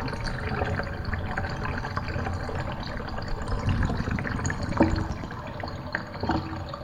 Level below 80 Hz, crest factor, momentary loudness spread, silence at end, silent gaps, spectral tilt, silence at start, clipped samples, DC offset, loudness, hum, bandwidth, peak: -36 dBFS; 22 dB; 9 LU; 0 s; none; -6 dB/octave; 0 s; under 0.1%; under 0.1%; -30 LUFS; none; 11 kHz; -8 dBFS